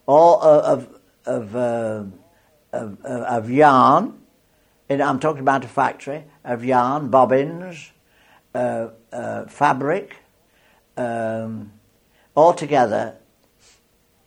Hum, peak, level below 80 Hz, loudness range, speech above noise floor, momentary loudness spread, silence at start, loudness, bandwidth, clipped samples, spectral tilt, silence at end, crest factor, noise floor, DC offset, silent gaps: none; -2 dBFS; -64 dBFS; 7 LU; 42 dB; 18 LU; 0.1 s; -19 LUFS; 10.5 kHz; under 0.1%; -6.5 dB/octave; 1.15 s; 18 dB; -61 dBFS; under 0.1%; none